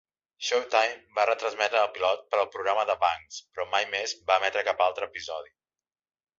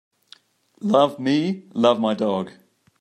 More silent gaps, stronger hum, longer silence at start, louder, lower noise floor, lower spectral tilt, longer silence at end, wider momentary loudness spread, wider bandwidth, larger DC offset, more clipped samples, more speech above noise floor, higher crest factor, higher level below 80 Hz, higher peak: neither; neither; second, 0.4 s vs 0.8 s; second, -27 LUFS vs -21 LUFS; first, under -90 dBFS vs -53 dBFS; second, -0.5 dB/octave vs -6.5 dB/octave; first, 0.95 s vs 0.5 s; about the same, 11 LU vs 10 LU; second, 7.8 kHz vs 11.5 kHz; neither; neither; first, over 63 dB vs 33 dB; about the same, 22 dB vs 18 dB; about the same, -70 dBFS vs -72 dBFS; about the same, -6 dBFS vs -4 dBFS